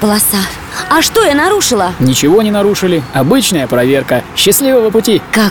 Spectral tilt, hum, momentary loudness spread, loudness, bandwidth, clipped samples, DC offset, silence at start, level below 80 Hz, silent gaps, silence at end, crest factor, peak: -3.5 dB/octave; none; 4 LU; -10 LUFS; over 20 kHz; under 0.1%; under 0.1%; 0 s; -38 dBFS; none; 0 s; 10 dB; 0 dBFS